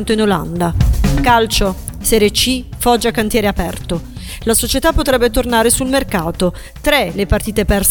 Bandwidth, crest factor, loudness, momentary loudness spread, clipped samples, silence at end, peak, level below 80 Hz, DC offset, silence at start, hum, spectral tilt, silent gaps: 19 kHz; 14 dB; -15 LUFS; 8 LU; under 0.1%; 0 s; 0 dBFS; -22 dBFS; under 0.1%; 0 s; none; -4 dB/octave; none